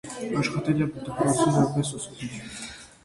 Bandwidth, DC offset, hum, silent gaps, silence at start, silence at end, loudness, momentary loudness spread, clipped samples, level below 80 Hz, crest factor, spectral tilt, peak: 11.5 kHz; under 0.1%; none; none; 0.05 s; 0.2 s; -26 LUFS; 15 LU; under 0.1%; -56 dBFS; 16 dB; -5.5 dB/octave; -10 dBFS